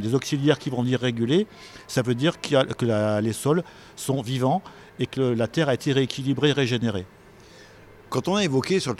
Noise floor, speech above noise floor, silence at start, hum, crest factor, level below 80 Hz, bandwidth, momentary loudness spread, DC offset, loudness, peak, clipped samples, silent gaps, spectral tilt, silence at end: -48 dBFS; 25 dB; 0 s; none; 20 dB; -58 dBFS; 15 kHz; 9 LU; under 0.1%; -24 LUFS; -4 dBFS; under 0.1%; none; -5.5 dB/octave; 0.05 s